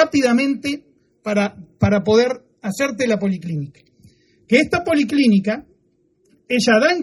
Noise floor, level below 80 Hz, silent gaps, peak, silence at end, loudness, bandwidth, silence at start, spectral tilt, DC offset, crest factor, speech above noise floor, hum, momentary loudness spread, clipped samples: -62 dBFS; -50 dBFS; none; 0 dBFS; 0 s; -18 LUFS; 13 kHz; 0 s; -5.5 dB/octave; under 0.1%; 18 dB; 44 dB; none; 13 LU; under 0.1%